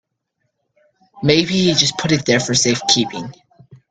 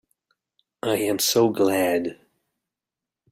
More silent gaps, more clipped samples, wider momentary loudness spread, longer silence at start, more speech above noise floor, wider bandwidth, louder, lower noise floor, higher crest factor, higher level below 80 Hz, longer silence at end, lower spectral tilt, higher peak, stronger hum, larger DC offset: neither; neither; about the same, 9 LU vs 10 LU; first, 1.15 s vs 0.85 s; second, 56 dB vs 67 dB; second, 10.5 kHz vs 16 kHz; first, -15 LUFS vs -22 LUFS; second, -72 dBFS vs -88 dBFS; about the same, 18 dB vs 18 dB; first, -52 dBFS vs -66 dBFS; second, 0.15 s vs 1.2 s; about the same, -3.5 dB/octave vs -3.5 dB/octave; first, 0 dBFS vs -6 dBFS; neither; neither